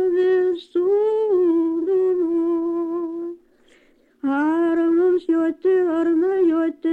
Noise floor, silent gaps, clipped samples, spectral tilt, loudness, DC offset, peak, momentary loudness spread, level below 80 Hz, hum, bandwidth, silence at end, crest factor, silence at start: -56 dBFS; none; under 0.1%; -7 dB/octave; -20 LUFS; under 0.1%; -12 dBFS; 7 LU; -66 dBFS; none; 4.4 kHz; 0 s; 8 dB; 0 s